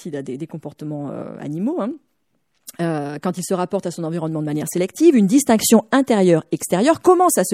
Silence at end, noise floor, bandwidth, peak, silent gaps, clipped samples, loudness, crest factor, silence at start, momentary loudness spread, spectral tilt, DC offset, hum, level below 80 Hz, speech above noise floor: 0 s; -70 dBFS; 16 kHz; -2 dBFS; none; under 0.1%; -18 LUFS; 18 dB; 0 s; 16 LU; -5 dB/octave; under 0.1%; none; -64 dBFS; 52 dB